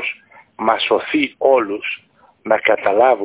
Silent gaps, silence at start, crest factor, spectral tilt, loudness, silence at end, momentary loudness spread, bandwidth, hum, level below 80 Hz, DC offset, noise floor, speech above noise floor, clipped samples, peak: none; 0 s; 16 dB; -7.5 dB/octave; -17 LUFS; 0 s; 13 LU; 4 kHz; none; -62 dBFS; under 0.1%; -38 dBFS; 22 dB; under 0.1%; 0 dBFS